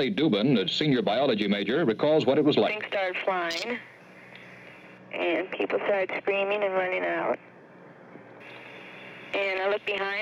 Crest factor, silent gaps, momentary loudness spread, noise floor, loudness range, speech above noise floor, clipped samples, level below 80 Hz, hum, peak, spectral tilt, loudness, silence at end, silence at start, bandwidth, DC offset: 16 dB; none; 22 LU; -50 dBFS; 7 LU; 24 dB; under 0.1%; -72 dBFS; none; -12 dBFS; -6 dB/octave; -26 LUFS; 0 s; 0 s; 11 kHz; under 0.1%